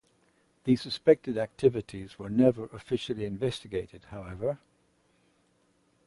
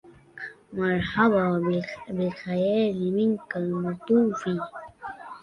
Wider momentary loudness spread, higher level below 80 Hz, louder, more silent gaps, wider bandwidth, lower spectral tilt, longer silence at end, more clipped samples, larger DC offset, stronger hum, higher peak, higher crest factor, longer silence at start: about the same, 18 LU vs 18 LU; about the same, -58 dBFS vs -58 dBFS; second, -29 LUFS vs -25 LUFS; neither; first, 11.5 kHz vs 9.2 kHz; about the same, -7 dB/octave vs -8 dB/octave; first, 1.5 s vs 0.05 s; neither; neither; neither; about the same, -8 dBFS vs -6 dBFS; about the same, 22 dB vs 18 dB; first, 0.65 s vs 0.05 s